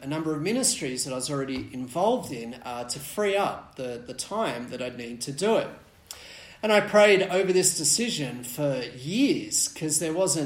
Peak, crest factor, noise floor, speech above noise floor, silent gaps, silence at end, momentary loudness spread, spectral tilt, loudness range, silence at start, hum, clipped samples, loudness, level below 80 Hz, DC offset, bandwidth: -6 dBFS; 20 dB; -46 dBFS; 20 dB; none; 0 s; 15 LU; -3 dB/octave; 7 LU; 0 s; none; under 0.1%; -25 LUFS; -62 dBFS; under 0.1%; 16.5 kHz